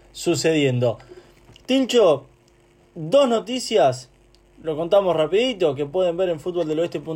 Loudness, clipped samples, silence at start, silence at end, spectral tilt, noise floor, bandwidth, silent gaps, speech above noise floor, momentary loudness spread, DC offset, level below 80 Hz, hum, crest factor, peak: -20 LUFS; under 0.1%; 0.15 s; 0 s; -5 dB/octave; -55 dBFS; 16 kHz; none; 35 dB; 9 LU; under 0.1%; -56 dBFS; none; 14 dB; -8 dBFS